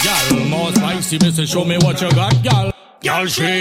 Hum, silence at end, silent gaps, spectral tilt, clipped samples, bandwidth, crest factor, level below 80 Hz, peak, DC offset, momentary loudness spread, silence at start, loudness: none; 0 s; none; -4.5 dB/octave; under 0.1%; 16.5 kHz; 14 dB; -40 dBFS; -2 dBFS; under 0.1%; 4 LU; 0 s; -15 LUFS